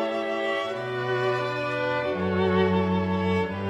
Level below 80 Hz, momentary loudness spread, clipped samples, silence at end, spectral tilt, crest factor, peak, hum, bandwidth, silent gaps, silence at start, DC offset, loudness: -58 dBFS; 5 LU; under 0.1%; 0 s; -7 dB/octave; 14 dB; -10 dBFS; none; 9.2 kHz; none; 0 s; under 0.1%; -26 LUFS